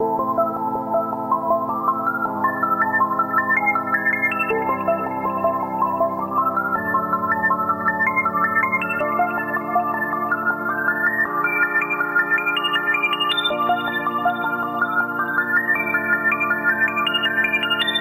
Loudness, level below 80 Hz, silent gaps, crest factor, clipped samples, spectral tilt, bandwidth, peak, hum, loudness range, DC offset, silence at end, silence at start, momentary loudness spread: -20 LUFS; -62 dBFS; none; 16 dB; under 0.1%; -5 dB/octave; 16.5 kHz; -6 dBFS; none; 2 LU; under 0.1%; 0 s; 0 s; 4 LU